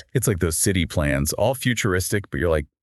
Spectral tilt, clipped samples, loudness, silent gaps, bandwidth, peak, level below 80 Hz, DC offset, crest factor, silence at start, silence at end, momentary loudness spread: -4.5 dB/octave; under 0.1%; -22 LUFS; none; 12.5 kHz; -4 dBFS; -36 dBFS; under 0.1%; 18 dB; 0.15 s; 0.2 s; 3 LU